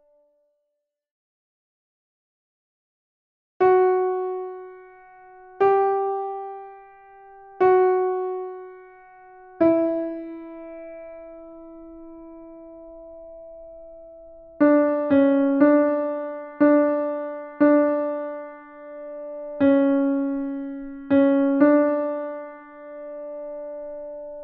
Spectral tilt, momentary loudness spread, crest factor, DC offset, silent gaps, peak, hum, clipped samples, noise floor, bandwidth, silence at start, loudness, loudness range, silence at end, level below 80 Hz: -9.5 dB/octave; 25 LU; 18 dB; under 0.1%; none; -6 dBFS; none; under 0.1%; -79 dBFS; 4.1 kHz; 3.6 s; -21 LUFS; 10 LU; 0 s; -62 dBFS